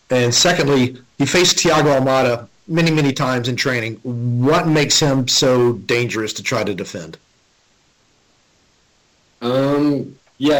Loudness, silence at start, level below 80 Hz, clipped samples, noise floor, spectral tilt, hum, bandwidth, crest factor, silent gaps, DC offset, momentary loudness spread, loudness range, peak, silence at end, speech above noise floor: -16 LUFS; 0.1 s; -50 dBFS; under 0.1%; -58 dBFS; -4 dB/octave; none; 17.5 kHz; 14 dB; none; under 0.1%; 11 LU; 10 LU; -4 dBFS; 0 s; 42 dB